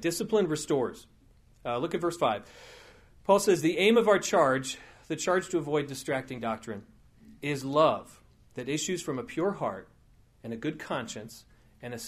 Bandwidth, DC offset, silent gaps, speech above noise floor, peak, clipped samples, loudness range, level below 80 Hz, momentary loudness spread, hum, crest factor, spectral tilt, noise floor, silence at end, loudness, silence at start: 15.5 kHz; under 0.1%; none; 32 dB; -8 dBFS; under 0.1%; 8 LU; -62 dBFS; 18 LU; none; 20 dB; -4.5 dB/octave; -60 dBFS; 0 s; -29 LUFS; 0 s